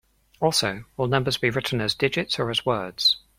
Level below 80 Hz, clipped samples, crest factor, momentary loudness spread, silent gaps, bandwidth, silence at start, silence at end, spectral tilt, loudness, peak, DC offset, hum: -54 dBFS; under 0.1%; 20 dB; 6 LU; none; 16.5 kHz; 0.4 s; 0.2 s; -4 dB/octave; -23 LUFS; -4 dBFS; under 0.1%; none